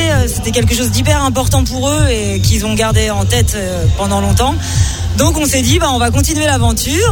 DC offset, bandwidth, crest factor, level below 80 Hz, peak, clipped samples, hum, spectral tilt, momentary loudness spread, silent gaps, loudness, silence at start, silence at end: 0.3%; 18 kHz; 12 dB; -20 dBFS; 0 dBFS; under 0.1%; none; -4.5 dB/octave; 3 LU; none; -13 LUFS; 0 s; 0 s